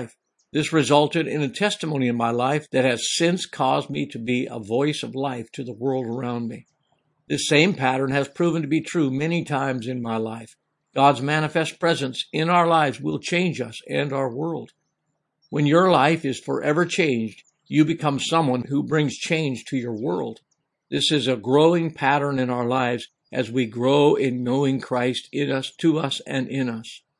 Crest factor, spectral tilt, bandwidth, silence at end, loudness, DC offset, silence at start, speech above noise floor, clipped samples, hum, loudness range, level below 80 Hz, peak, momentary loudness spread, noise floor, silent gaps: 22 dB; -5 dB/octave; 11.5 kHz; 0.2 s; -22 LUFS; under 0.1%; 0 s; 54 dB; under 0.1%; none; 3 LU; -68 dBFS; -2 dBFS; 11 LU; -76 dBFS; none